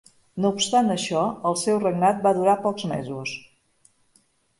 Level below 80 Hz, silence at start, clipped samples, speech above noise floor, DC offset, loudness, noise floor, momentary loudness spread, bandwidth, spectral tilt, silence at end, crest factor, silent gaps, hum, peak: -64 dBFS; 0.35 s; under 0.1%; 41 dB; under 0.1%; -23 LUFS; -64 dBFS; 11 LU; 11.5 kHz; -4.5 dB/octave; 1.2 s; 18 dB; none; none; -6 dBFS